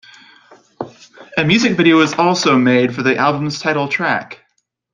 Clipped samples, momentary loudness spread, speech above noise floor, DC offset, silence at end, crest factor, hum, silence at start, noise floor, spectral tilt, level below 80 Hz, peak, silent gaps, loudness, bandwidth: under 0.1%; 19 LU; 52 dB; under 0.1%; 0.6 s; 16 dB; none; 0.8 s; -66 dBFS; -5 dB/octave; -56 dBFS; 0 dBFS; none; -14 LUFS; 9.6 kHz